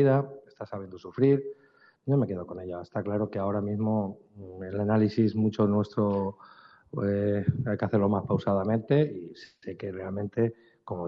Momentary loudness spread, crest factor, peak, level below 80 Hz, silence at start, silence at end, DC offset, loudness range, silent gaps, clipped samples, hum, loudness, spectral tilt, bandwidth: 15 LU; 16 dB; -12 dBFS; -66 dBFS; 0 s; 0 s; under 0.1%; 3 LU; none; under 0.1%; none; -28 LUFS; -8.5 dB/octave; 6.4 kHz